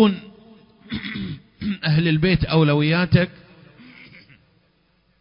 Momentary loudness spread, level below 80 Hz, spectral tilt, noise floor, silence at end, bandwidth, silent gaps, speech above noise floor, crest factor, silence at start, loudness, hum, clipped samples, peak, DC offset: 14 LU; -42 dBFS; -11.5 dB/octave; -63 dBFS; 1.9 s; 5.4 kHz; none; 43 dB; 20 dB; 0 s; -20 LUFS; none; under 0.1%; -2 dBFS; under 0.1%